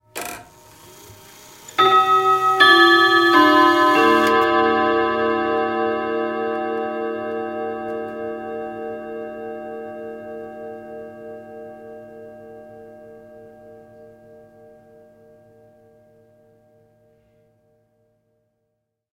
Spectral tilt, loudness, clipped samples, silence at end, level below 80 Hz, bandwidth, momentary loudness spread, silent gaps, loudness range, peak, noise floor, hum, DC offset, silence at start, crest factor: -3.5 dB/octave; -17 LUFS; under 0.1%; 5.05 s; -60 dBFS; 16 kHz; 25 LU; none; 23 LU; 0 dBFS; -75 dBFS; none; under 0.1%; 0.15 s; 22 dB